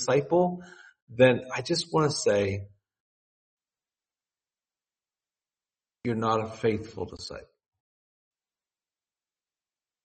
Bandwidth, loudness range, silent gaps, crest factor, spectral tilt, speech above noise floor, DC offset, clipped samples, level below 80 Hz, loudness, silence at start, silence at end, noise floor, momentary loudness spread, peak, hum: 8.4 kHz; 14 LU; 1.02-1.07 s, 3.00-3.57 s; 26 dB; -5 dB/octave; over 64 dB; under 0.1%; under 0.1%; -64 dBFS; -27 LUFS; 0 s; 2.65 s; under -90 dBFS; 18 LU; -6 dBFS; none